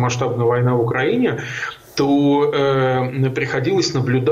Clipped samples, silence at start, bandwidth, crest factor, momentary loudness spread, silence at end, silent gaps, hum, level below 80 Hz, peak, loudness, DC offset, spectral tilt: under 0.1%; 0 s; 13.5 kHz; 10 dB; 6 LU; 0 s; none; none; -54 dBFS; -8 dBFS; -18 LUFS; under 0.1%; -6 dB/octave